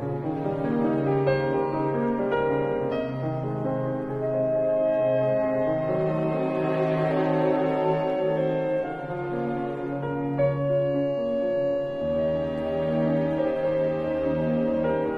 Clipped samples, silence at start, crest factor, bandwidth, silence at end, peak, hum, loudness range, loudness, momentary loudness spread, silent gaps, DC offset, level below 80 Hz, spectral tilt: under 0.1%; 0 s; 14 dB; 5.6 kHz; 0 s; -10 dBFS; none; 2 LU; -26 LUFS; 5 LU; none; under 0.1%; -52 dBFS; -9.5 dB/octave